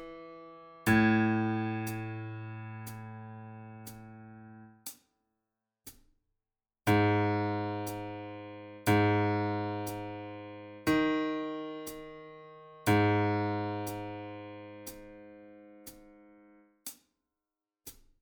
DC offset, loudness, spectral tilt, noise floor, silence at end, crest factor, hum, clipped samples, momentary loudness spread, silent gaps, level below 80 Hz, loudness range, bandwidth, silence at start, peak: under 0.1%; -31 LUFS; -6.5 dB/octave; under -90 dBFS; 0.3 s; 20 dB; none; under 0.1%; 24 LU; none; -62 dBFS; 18 LU; over 20 kHz; 0 s; -14 dBFS